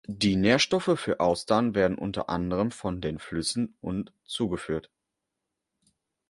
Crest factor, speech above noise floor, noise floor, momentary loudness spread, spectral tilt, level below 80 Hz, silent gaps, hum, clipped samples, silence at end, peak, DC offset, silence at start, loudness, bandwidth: 22 dB; 58 dB; -84 dBFS; 12 LU; -5 dB/octave; -52 dBFS; none; none; under 0.1%; 1.5 s; -6 dBFS; under 0.1%; 0.1 s; -27 LUFS; 11.5 kHz